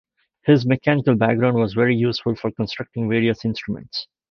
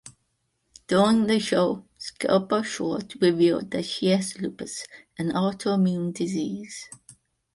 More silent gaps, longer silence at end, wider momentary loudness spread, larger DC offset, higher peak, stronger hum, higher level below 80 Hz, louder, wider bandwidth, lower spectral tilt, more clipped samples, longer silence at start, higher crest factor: neither; second, 0.25 s vs 0.6 s; second, 10 LU vs 15 LU; neither; first, -2 dBFS vs -8 dBFS; neither; first, -54 dBFS vs -64 dBFS; first, -20 LUFS vs -25 LUFS; second, 6.6 kHz vs 11.5 kHz; first, -8 dB/octave vs -5.5 dB/octave; neither; first, 0.45 s vs 0.05 s; about the same, 18 dB vs 18 dB